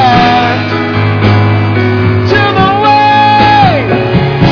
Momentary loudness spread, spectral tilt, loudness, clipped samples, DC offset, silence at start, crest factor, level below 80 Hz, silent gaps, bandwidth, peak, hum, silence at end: 5 LU; -7.5 dB/octave; -8 LUFS; 0.7%; under 0.1%; 0 s; 8 dB; -30 dBFS; none; 5.4 kHz; 0 dBFS; none; 0 s